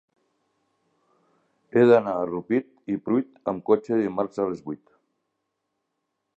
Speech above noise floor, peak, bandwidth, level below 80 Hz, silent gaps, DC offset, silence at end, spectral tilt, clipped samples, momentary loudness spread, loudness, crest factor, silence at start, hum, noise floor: 56 dB; -6 dBFS; 7.8 kHz; -68 dBFS; none; under 0.1%; 1.6 s; -8.5 dB/octave; under 0.1%; 14 LU; -24 LUFS; 20 dB; 1.75 s; none; -79 dBFS